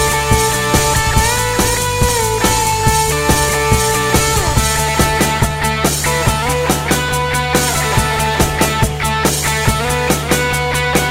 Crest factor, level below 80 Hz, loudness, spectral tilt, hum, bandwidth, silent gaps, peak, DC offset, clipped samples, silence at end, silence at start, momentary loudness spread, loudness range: 14 dB; -24 dBFS; -14 LUFS; -3.5 dB/octave; none; 16.5 kHz; none; 0 dBFS; 0.8%; under 0.1%; 0 s; 0 s; 2 LU; 1 LU